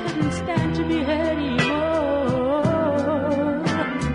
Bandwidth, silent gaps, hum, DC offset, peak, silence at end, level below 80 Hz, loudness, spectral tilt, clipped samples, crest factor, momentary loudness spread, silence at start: 11 kHz; none; none; under 0.1%; -6 dBFS; 0 s; -44 dBFS; -22 LUFS; -6.5 dB/octave; under 0.1%; 16 dB; 3 LU; 0 s